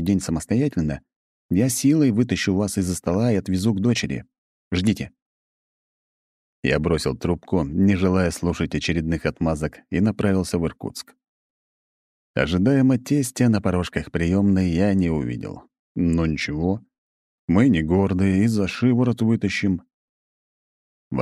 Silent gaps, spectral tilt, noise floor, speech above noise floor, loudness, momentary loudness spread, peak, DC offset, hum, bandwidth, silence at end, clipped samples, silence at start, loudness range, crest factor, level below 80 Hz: 1.16-1.49 s, 4.38-4.71 s, 5.22-6.63 s, 11.28-12.34 s, 15.79-15.95 s, 16.98-17.48 s, 19.94-21.11 s; -6 dB/octave; under -90 dBFS; over 69 dB; -22 LUFS; 10 LU; -4 dBFS; under 0.1%; none; 14.5 kHz; 0 s; under 0.1%; 0 s; 5 LU; 18 dB; -42 dBFS